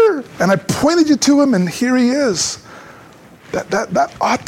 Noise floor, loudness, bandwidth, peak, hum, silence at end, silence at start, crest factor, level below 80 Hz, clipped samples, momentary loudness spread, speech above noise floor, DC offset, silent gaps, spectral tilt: -42 dBFS; -15 LUFS; 16 kHz; -2 dBFS; none; 0 s; 0 s; 14 dB; -50 dBFS; under 0.1%; 8 LU; 27 dB; under 0.1%; none; -4.5 dB/octave